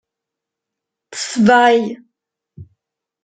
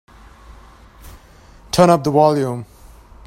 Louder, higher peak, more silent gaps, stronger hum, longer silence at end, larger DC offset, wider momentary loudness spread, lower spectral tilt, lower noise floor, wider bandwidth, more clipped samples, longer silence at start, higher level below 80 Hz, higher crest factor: about the same, -14 LUFS vs -15 LUFS; about the same, -2 dBFS vs 0 dBFS; neither; neither; about the same, 0.6 s vs 0.65 s; neither; first, 21 LU vs 11 LU; second, -4.5 dB/octave vs -6 dB/octave; first, -83 dBFS vs -45 dBFS; second, 9.4 kHz vs 16 kHz; neither; about the same, 1.1 s vs 1.05 s; second, -60 dBFS vs -44 dBFS; about the same, 16 dB vs 18 dB